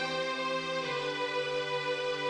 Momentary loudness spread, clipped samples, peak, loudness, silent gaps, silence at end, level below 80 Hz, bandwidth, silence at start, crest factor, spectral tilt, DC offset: 1 LU; under 0.1%; -22 dBFS; -32 LUFS; none; 0 s; -72 dBFS; 10.5 kHz; 0 s; 12 dB; -3.5 dB/octave; under 0.1%